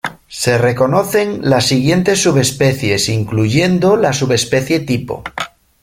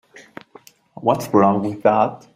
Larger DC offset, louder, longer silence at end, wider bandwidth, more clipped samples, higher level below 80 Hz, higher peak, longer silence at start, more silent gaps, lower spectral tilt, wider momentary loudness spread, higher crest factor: neither; first, -14 LUFS vs -18 LUFS; first, 0.35 s vs 0.2 s; about the same, 16.5 kHz vs 16 kHz; neither; first, -44 dBFS vs -60 dBFS; about the same, 0 dBFS vs -2 dBFS; about the same, 0.05 s vs 0.15 s; neither; second, -5 dB/octave vs -7 dB/octave; first, 9 LU vs 5 LU; about the same, 14 dB vs 18 dB